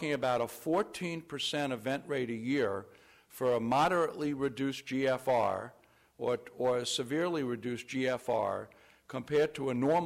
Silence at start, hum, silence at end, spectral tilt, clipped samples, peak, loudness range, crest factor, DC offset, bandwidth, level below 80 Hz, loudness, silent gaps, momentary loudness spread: 0 s; none; 0 s; -5 dB/octave; under 0.1%; -20 dBFS; 2 LU; 12 dB; under 0.1%; 16 kHz; -70 dBFS; -33 LUFS; none; 9 LU